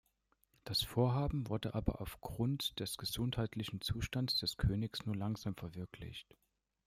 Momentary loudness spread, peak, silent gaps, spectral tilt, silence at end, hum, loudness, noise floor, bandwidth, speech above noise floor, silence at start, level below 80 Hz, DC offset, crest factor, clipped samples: 13 LU; -20 dBFS; none; -5.5 dB/octave; 0.65 s; none; -38 LUFS; -78 dBFS; 16 kHz; 39 dB; 0.65 s; -52 dBFS; under 0.1%; 20 dB; under 0.1%